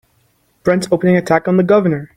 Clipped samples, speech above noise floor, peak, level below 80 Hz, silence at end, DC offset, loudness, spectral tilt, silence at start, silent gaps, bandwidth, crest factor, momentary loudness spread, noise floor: under 0.1%; 45 dB; -2 dBFS; -50 dBFS; 0.1 s; under 0.1%; -14 LUFS; -7 dB/octave; 0.65 s; none; 12.5 kHz; 14 dB; 5 LU; -59 dBFS